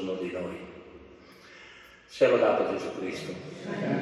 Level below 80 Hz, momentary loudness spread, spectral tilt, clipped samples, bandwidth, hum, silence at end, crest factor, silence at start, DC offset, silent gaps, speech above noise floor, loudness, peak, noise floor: -68 dBFS; 26 LU; -6 dB/octave; under 0.1%; 12 kHz; none; 0 s; 20 dB; 0 s; under 0.1%; none; 24 dB; -29 LUFS; -10 dBFS; -52 dBFS